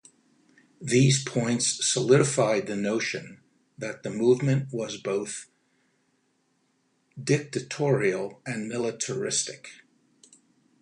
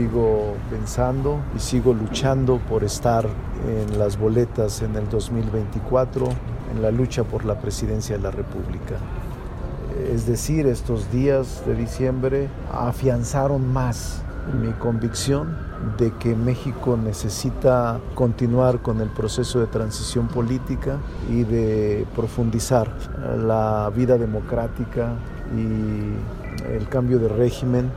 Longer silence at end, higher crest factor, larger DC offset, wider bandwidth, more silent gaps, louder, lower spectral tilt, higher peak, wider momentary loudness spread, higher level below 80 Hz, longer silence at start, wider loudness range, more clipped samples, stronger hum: first, 1.05 s vs 0 s; about the same, 20 dB vs 18 dB; neither; second, 11 kHz vs 15 kHz; neither; second, -26 LUFS vs -23 LUFS; second, -4.5 dB/octave vs -6.5 dB/octave; second, -8 dBFS vs -4 dBFS; first, 15 LU vs 9 LU; second, -68 dBFS vs -32 dBFS; first, 0.8 s vs 0 s; first, 6 LU vs 3 LU; neither; neither